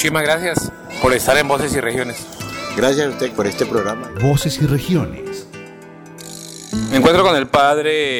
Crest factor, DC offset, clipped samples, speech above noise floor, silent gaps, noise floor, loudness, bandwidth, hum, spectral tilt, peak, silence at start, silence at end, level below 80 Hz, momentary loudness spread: 14 dB; under 0.1%; under 0.1%; 21 dB; none; -37 dBFS; -17 LUFS; 19 kHz; none; -4.5 dB/octave; -2 dBFS; 0 s; 0 s; -42 dBFS; 18 LU